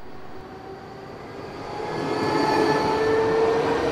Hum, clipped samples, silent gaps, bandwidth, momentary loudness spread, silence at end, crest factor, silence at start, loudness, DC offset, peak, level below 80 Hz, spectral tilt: none; under 0.1%; none; 14 kHz; 19 LU; 0 s; 16 dB; 0 s; -22 LUFS; under 0.1%; -8 dBFS; -50 dBFS; -5.5 dB/octave